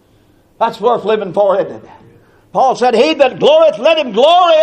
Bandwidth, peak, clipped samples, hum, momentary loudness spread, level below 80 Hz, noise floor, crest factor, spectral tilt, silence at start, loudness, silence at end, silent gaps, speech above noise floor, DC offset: 9.4 kHz; 0 dBFS; under 0.1%; none; 9 LU; -56 dBFS; -50 dBFS; 12 dB; -4.5 dB/octave; 0.6 s; -11 LUFS; 0 s; none; 39 dB; under 0.1%